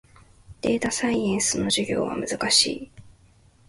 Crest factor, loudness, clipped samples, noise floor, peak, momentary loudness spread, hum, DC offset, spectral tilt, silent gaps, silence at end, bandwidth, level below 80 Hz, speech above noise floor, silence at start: 22 dB; -23 LUFS; under 0.1%; -56 dBFS; -4 dBFS; 9 LU; none; under 0.1%; -2.5 dB/octave; none; 0.6 s; 12 kHz; -52 dBFS; 33 dB; 0.5 s